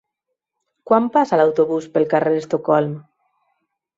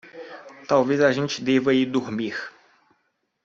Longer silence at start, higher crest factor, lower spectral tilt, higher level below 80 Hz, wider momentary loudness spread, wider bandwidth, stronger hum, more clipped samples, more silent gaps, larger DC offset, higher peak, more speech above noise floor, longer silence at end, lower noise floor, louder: first, 0.85 s vs 0.05 s; about the same, 18 dB vs 18 dB; first, -7.5 dB/octave vs -5.5 dB/octave; about the same, -66 dBFS vs -68 dBFS; second, 5 LU vs 20 LU; about the same, 7.8 kHz vs 7.6 kHz; neither; neither; neither; neither; first, -2 dBFS vs -6 dBFS; first, 62 dB vs 51 dB; about the same, 0.95 s vs 0.95 s; first, -79 dBFS vs -72 dBFS; first, -18 LUFS vs -22 LUFS